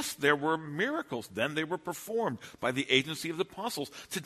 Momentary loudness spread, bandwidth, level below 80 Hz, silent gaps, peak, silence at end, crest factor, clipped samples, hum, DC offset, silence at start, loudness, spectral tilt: 9 LU; 13.5 kHz; -70 dBFS; none; -8 dBFS; 0 s; 24 dB; under 0.1%; none; under 0.1%; 0 s; -32 LUFS; -3.5 dB/octave